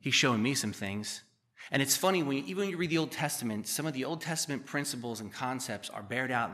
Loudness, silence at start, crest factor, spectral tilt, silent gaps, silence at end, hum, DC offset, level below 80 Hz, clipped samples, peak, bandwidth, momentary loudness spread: -32 LUFS; 0.05 s; 20 dB; -3.5 dB/octave; none; 0 s; none; under 0.1%; -76 dBFS; under 0.1%; -14 dBFS; 15 kHz; 11 LU